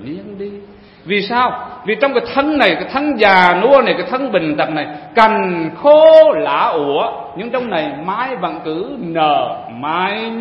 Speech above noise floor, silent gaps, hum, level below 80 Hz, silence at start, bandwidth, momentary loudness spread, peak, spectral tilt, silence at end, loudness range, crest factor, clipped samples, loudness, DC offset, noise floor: 24 dB; none; none; -52 dBFS; 0 s; 6 kHz; 14 LU; 0 dBFS; -6.5 dB/octave; 0 s; 7 LU; 14 dB; 0.1%; -14 LUFS; under 0.1%; -37 dBFS